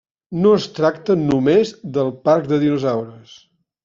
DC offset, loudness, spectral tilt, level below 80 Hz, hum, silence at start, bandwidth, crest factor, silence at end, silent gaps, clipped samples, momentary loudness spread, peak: under 0.1%; -18 LUFS; -6.5 dB/octave; -54 dBFS; none; 0.3 s; 7.4 kHz; 16 dB; 0.65 s; none; under 0.1%; 7 LU; -2 dBFS